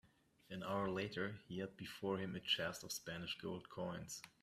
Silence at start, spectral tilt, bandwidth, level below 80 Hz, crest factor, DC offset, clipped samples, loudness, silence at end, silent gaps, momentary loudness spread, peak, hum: 0.05 s; -4 dB/octave; 15.5 kHz; -74 dBFS; 20 dB; under 0.1%; under 0.1%; -44 LUFS; 0.15 s; none; 10 LU; -24 dBFS; none